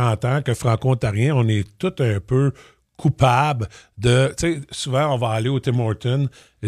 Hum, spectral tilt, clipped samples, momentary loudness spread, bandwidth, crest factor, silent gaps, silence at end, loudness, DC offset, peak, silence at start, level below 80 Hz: none; -6.5 dB/octave; under 0.1%; 6 LU; 13 kHz; 18 dB; none; 0 s; -20 LUFS; under 0.1%; -2 dBFS; 0 s; -44 dBFS